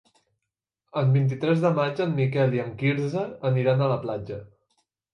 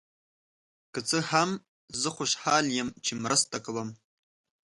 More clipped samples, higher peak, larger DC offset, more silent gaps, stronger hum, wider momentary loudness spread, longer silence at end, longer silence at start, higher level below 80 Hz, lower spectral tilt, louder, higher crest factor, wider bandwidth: neither; about the same, -10 dBFS vs -10 dBFS; neither; second, none vs 1.68-1.88 s; neither; second, 10 LU vs 13 LU; about the same, 0.65 s vs 0.75 s; about the same, 0.95 s vs 0.95 s; first, -62 dBFS vs -70 dBFS; first, -8.5 dB/octave vs -2.5 dB/octave; first, -25 LUFS vs -28 LUFS; second, 14 dB vs 22 dB; second, 6.6 kHz vs 11.5 kHz